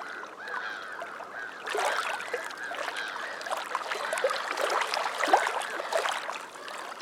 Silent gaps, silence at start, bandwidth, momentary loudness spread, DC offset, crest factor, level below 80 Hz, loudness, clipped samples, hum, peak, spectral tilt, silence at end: none; 0 s; 18.5 kHz; 12 LU; under 0.1%; 24 dB; -88 dBFS; -31 LUFS; under 0.1%; none; -8 dBFS; 0 dB/octave; 0 s